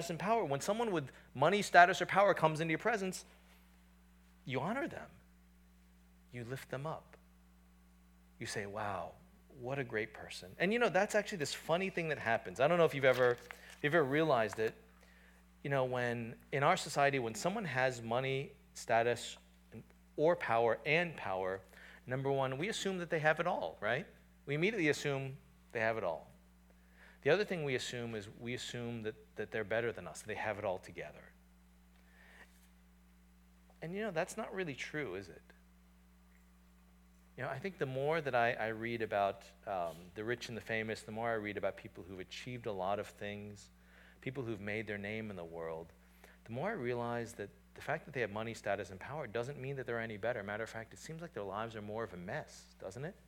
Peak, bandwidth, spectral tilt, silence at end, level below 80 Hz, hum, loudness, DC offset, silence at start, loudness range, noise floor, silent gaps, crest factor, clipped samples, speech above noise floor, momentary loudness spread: -10 dBFS; 18.5 kHz; -5 dB/octave; 0.15 s; -66 dBFS; none; -37 LUFS; under 0.1%; 0 s; 12 LU; -64 dBFS; none; 28 dB; under 0.1%; 27 dB; 16 LU